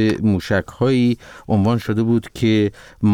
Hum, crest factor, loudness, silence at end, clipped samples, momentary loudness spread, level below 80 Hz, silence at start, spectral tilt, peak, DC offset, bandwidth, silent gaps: none; 10 dB; -19 LUFS; 0 s; under 0.1%; 5 LU; -46 dBFS; 0 s; -7.5 dB/octave; -8 dBFS; under 0.1%; 14 kHz; none